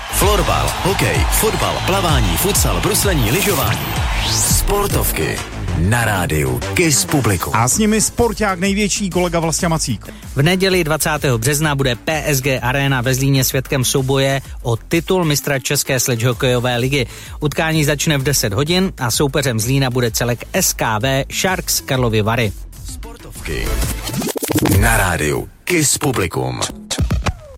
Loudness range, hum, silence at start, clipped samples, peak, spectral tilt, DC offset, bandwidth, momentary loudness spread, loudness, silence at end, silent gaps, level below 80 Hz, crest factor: 3 LU; none; 0 s; under 0.1%; 0 dBFS; -4 dB/octave; under 0.1%; 16.5 kHz; 7 LU; -16 LUFS; 0 s; none; -28 dBFS; 16 dB